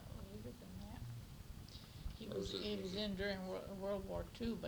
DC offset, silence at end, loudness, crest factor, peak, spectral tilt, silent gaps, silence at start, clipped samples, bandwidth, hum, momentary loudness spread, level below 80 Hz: under 0.1%; 0 s; -46 LUFS; 18 dB; -28 dBFS; -5.5 dB/octave; none; 0 s; under 0.1%; over 20 kHz; none; 12 LU; -56 dBFS